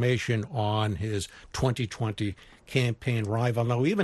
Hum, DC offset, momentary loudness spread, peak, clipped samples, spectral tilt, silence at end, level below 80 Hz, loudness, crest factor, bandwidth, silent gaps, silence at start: none; under 0.1%; 8 LU; -10 dBFS; under 0.1%; -6 dB/octave; 0 s; -52 dBFS; -29 LUFS; 18 dB; 12.5 kHz; none; 0 s